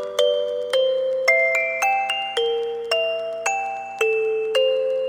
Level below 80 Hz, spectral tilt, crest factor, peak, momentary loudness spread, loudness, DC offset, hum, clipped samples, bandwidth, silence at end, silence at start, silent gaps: -68 dBFS; 0.5 dB/octave; 18 dB; -4 dBFS; 7 LU; -21 LUFS; under 0.1%; 60 Hz at -55 dBFS; under 0.1%; 16.5 kHz; 0 s; 0 s; none